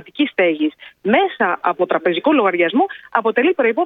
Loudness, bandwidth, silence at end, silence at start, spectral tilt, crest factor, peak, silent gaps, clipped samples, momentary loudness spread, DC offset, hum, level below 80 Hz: -17 LUFS; 4.1 kHz; 0 s; 0.15 s; -8 dB/octave; 16 dB; 0 dBFS; none; under 0.1%; 5 LU; under 0.1%; none; -66 dBFS